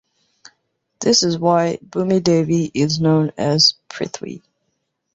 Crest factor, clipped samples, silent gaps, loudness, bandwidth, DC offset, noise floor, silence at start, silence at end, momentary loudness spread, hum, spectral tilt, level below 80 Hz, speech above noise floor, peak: 18 dB; under 0.1%; none; -17 LUFS; 8 kHz; under 0.1%; -72 dBFS; 1 s; 0.75 s; 14 LU; none; -4.5 dB/octave; -56 dBFS; 55 dB; -2 dBFS